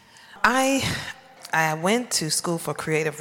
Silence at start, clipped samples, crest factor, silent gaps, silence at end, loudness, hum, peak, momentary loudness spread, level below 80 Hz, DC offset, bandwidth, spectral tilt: 0.3 s; under 0.1%; 20 dB; none; 0 s; -23 LUFS; none; -4 dBFS; 8 LU; -54 dBFS; under 0.1%; 17 kHz; -3 dB/octave